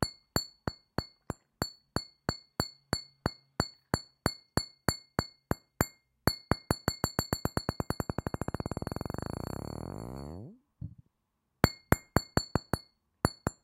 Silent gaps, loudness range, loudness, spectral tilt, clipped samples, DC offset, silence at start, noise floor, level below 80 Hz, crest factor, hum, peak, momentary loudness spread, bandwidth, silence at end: none; 4 LU; -35 LUFS; -4.5 dB/octave; under 0.1%; under 0.1%; 0 s; -81 dBFS; -46 dBFS; 34 dB; none; -2 dBFS; 11 LU; 16.5 kHz; 0.1 s